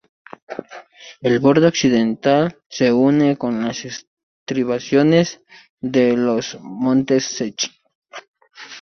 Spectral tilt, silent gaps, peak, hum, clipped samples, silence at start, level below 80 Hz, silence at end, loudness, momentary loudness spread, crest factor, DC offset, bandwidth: -5.5 dB/octave; 2.66-2.70 s, 4.07-4.17 s, 4.23-4.46 s, 5.70-5.77 s, 7.95-8.02 s, 8.28-8.34 s; -2 dBFS; none; under 0.1%; 0.5 s; -58 dBFS; 0 s; -18 LUFS; 19 LU; 16 dB; under 0.1%; 6.8 kHz